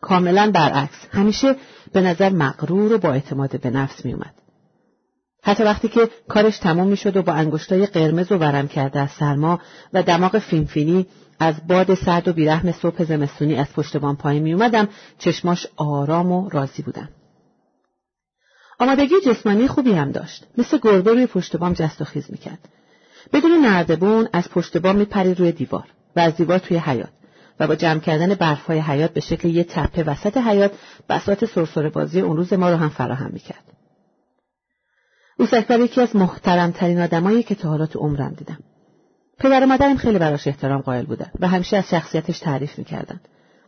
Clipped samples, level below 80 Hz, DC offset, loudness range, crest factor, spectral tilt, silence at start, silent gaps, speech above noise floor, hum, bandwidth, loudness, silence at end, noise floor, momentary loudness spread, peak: under 0.1%; -46 dBFS; under 0.1%; 4 LU; 14 dB; -7 dB/octave; 0 s; none; 60 dB; none; 6.6 kHz; -19 LUFS; 0.5 s; -79 dBFS; 10 LU; -4 dBFS